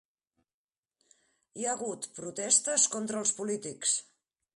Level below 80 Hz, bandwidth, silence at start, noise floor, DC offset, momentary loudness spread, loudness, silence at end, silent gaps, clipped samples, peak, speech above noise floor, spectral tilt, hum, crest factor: -82 dBFS; 11.5 kHz; 1.55 s; -81 dBFS; under 0.1%; 13 LU; -29 LUFS; 0.55 s; none; under 0.1%; -10 dBFS; 49 dB; -1.5 dB/octave; none; 24 dB